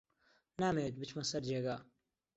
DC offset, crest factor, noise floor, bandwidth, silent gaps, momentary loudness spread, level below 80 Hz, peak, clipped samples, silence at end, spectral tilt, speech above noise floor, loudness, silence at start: under 0.1%; 18 dB; -75 dBFS; 8 kHz; none; 9 LU; -70 dBFS; -22 dBFS; under 0.1%; 0.55 s; -5 dB/octave; 37 dB; -39 LUFS; 0.6 s